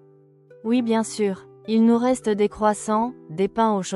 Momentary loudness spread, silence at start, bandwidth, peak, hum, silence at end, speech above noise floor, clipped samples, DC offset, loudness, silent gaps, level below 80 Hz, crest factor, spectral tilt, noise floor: 8 LU; 0.65 s; 12 kHz; -6 dBFS; none; 0 s; 32 dB; under 0.1%; under 0.1%; -22 LUFS; none; -58 dBFS; 16 dB; -5.5 dB/octave; -53 dBFS